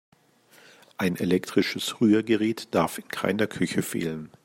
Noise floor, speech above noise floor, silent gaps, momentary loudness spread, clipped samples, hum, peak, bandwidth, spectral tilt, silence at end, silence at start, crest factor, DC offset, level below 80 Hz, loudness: -58 dBFS; 33 dB; none; 8 LU; under 0.1%; none; -8 dBFS; 16 kHz; -5 dB/octave; 0.2 s; 1 s; 18 dB; under 0.1%; -66 dBFS; -26 LUFS